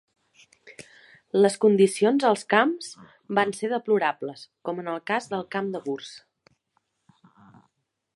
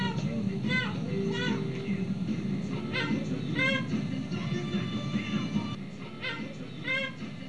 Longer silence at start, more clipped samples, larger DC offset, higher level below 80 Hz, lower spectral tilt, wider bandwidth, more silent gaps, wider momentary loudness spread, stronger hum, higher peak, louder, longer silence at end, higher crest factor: first, 0.65 s vs 0 s; neither; second, under 0.1% vs 0.4%; second, -76 dBFS vs -60 dBFS; about the same, -5 dB/octave vs -6 dB/octave; first, 11.5 kHz vs 10 kHz; neither; first, 17 LU vs 7 LU; neither; first, -4 dBFS vs -16 dBFS; first, -24 LUFS vs -32 LUFS; first, 1.95 s vs 0 s; first, 22 dB vs 16 dB